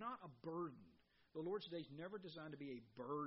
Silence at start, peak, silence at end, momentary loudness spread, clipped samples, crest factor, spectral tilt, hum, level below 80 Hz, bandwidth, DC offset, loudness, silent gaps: 0 s; -36 dBFS; 0 s; 6 LU; under 0.1%; 14 dB; -5 dB/octave; none; -86 dBFS; 5.6 kHz; under 0.1%; -51 LUFS; none